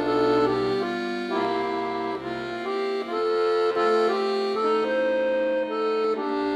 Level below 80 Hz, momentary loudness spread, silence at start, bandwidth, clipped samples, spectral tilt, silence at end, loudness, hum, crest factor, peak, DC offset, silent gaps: -60 dBFS; 7 LU; 0 s; 10.5 kHz; under 0.1%; -5.5 dB/octave; 0 s; -25 LUFS; none; 14 dB; -12 dBFS; under 0.1%; none